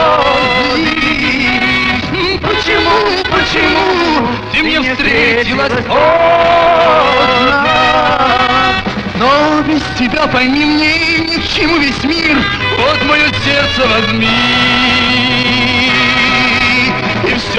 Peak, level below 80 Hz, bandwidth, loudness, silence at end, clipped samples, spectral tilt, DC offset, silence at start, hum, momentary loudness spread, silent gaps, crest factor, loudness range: 0 dBFS; -32 dBFS; 11 kHz; -10 LUFS; 0 s; under 0.1%; -4.5 dB/octave; under 0.1%; 0 s; none; 4 LU; none; 10 dB; 2 LU